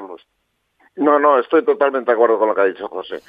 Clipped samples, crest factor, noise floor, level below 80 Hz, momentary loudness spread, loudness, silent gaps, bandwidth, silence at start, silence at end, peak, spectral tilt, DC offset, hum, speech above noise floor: under 0.1%; 16 dB; -69 dBFS; -72 dBFS; 12 LU; -16 LUFS; none; 4.9 kHz; 0 s; 0.1 s; 0 dBFS; -7 dB/octave; under 0.1%; none; 54 dB